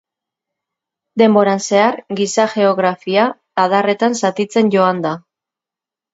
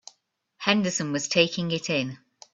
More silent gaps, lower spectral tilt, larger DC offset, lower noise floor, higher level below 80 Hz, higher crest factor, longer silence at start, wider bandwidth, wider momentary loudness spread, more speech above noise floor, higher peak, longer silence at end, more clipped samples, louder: neither; first, -5 dB/octave vs -3.5 dB/octave; neither; first, -88 dBFS vs -69 dBFS; about the same, -68 dBFS vs -66 dBFS; second, 16 dB vs 24 dB; first, 1.15 s vs 0.6 s; about the same, 8 kHz vs 8.2 kHz; about the same, 7 LU vs 8 LU; first, 73 dB vs 44 dB; first, 0 dBFS vs -4 dBFS; first, 0.95 s vs 0.4 s; neither; first, -15 LUFS vs -25 LUFS